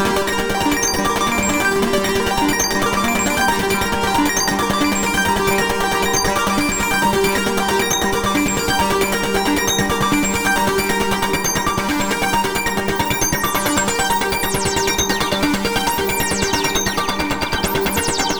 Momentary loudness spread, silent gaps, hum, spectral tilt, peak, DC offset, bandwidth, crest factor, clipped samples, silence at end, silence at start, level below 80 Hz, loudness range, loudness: 2 LU; none; none; -3 dB/octave; -2 dBFS; under 0.1%; over 20 kHz; 14 dB; under 0.1%; 0 s; 0 s; -34 dBFS; 1 LU; -17 LUFS